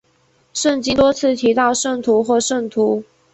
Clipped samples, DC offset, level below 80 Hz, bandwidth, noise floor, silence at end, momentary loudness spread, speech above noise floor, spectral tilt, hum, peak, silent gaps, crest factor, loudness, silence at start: under 0.1%; under 0.1%; -48 dBFS; 8.4 kHz; -58 dBFS; 0.3 s; 5 LU; 42 dB; -3 dB/octave; none; -2 dBFS; none; 14 dB; -17 LUFS; 0.55 s